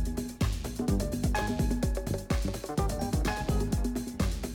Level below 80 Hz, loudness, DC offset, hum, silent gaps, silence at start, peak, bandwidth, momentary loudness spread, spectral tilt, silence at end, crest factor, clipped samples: -34 dBFS; -31 LUFS; under 0.1%; none; none; 0 s; -18 dBFS; 18.5 kHz; 3 LU; -6 dB/octave; 0 s; 12 dB; under 0.1%